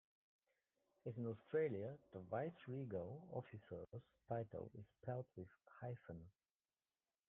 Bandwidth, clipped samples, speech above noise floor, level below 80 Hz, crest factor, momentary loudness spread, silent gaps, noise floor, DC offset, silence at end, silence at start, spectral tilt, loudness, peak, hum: 3.8 kHz; under 0.1%; over 41 dB; -82 dBFS; 18 dB; 14 LU; none; under -90 dBFS; under 0.1%; 1 s; 1.05 s; -6 dB/octave; -50 LUFS; -32 dBFS; none